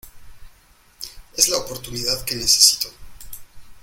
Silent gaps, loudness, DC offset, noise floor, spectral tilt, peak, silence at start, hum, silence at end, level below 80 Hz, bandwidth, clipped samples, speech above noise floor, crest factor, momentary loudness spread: none; -17 LUFS; under 0.1%; -53 dBFS; 0 dB/octave; 0 dBFS; 0.05 s; none; 0.05 s; -44 dBFS; 17 kHz; under 0.1%; 33 dB; 24 dB; 26 LU